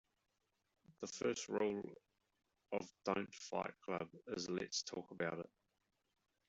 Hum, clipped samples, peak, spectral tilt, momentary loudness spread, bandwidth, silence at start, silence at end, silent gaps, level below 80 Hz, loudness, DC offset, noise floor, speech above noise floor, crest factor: none; under 0.1%; -22 dBFS; -3.5 dB/octave; 10 LU; 8.2 kHz; 0.9 s; 1.05 s; none; -82 dBFS; -44 LUFS; under 0.1%; -86 dBFS; 42 dB; 24 dB